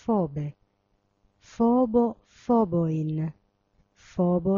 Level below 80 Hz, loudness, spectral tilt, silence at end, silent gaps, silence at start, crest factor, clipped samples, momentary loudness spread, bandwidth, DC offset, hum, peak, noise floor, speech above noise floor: -56 dBFS; -26 LUFS; -10.5 dB/octave; 0 s; none; 0.05 s; 14 dB; under 0.1%; 13 LU; 7.2 kHz; under 0.1%; none; -12 dBFS; -71 dBFS; 47 dB